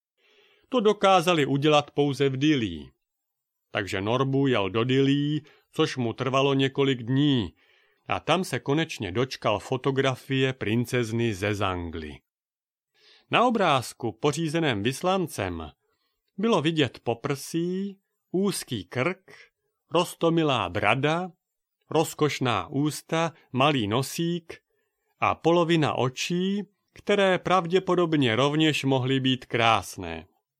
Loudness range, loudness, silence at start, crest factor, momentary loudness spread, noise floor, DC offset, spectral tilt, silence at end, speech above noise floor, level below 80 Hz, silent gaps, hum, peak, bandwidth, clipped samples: 4 LU; -25 LUFS; 0.7 s; 22 dB; 11 LU; under -90 dBFS; under 0.1%; -5.5 dB/octave; 0.4 s; over 65 dB; -60 dBFS; none; none; -4 dBFS; 16 kHz; under 0.1%